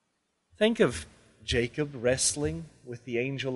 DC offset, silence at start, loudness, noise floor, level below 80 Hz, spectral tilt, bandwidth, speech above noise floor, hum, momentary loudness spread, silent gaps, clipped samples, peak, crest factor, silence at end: under 0.1%; 0.6 s; -28 LUFS; -77 dBFS; -50 dBFS; -3.5 dB/octave; 11.5 kHz; 49 dB; none; 18 LU; none; under 0.1%; -10 dBFS; 20 dB; 0 s